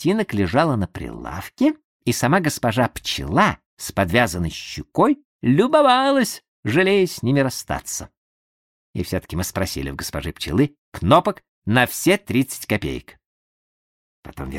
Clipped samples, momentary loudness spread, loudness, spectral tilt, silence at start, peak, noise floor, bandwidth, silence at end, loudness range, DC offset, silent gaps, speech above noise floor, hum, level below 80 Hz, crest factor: under 0.1%; 13 LU; -20 LUFS; -5 dB/octave; 0 s; -2 dBFS; under -90 dBFS; 16.5 kHz; 0 s; 6 LU; under 0.1%; 1.84-2.00 s, 3.66-3.77 s, 5.25-5.40 s, 6.48-6.63 s, 8.17-8.94 s, 10.78-10.92 s, 11.48-11.62 s, 13.26-14.23 s; over 70 dB; none; -42 dBFS; 20 dB